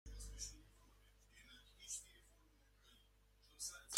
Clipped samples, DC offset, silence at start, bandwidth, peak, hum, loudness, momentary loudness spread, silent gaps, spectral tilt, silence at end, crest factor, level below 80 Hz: under 0.1%; under 0.1%; 0.05 s; 16 kHz; -6 dBFS; 50 Hz at -70 dBFS; -52 LUFS; 20 LU; none; -0.5 dB/octave; 0 s; 40 dB; -62 dBFS